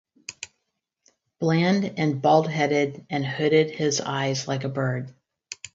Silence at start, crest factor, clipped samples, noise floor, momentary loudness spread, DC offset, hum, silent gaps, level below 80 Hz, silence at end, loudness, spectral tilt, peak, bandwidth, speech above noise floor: 0.3 s; 20 dB; under 0.1%; -79 dBFS; 19 LU; under 0.1%; none; none; -68 dBFS; 0.05 s; -24 LUFS; -5 dB/octave; -6 dBFS; 8 kHz; 56 dB